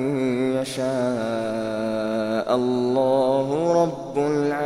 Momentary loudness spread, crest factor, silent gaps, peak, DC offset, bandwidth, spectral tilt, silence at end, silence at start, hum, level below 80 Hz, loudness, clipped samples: 5 LU; 16 dB; none; -6 dBFS; under 0.1%; 13 kHz; -6.5 dB/octave; 0 s; 0 s; none; -58 dBFS; -23 LUFS; under 0.1%